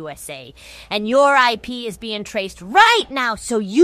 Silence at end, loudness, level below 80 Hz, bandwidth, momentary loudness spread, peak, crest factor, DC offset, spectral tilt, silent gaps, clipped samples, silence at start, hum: 0 s; -17 LUFS; -50 dBFS; 15.5 kHz; 18 LU; 0 dBFS; 18 dB; under 0.1%; -3 dB/octave; none; under 0.1%; 0 s; none